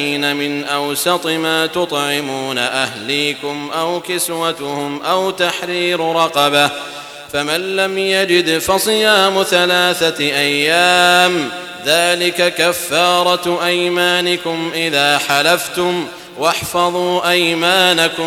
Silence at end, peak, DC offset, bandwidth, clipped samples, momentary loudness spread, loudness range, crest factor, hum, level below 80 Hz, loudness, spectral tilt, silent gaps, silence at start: 0 s; 0 dBFS; under 0.1%; 18 kHz; under 0.1%; 8 LU; 5 LU; 16 dB; none; -54 dBFS; -14 LUFS; -2.5 dB/octave; none; 0 s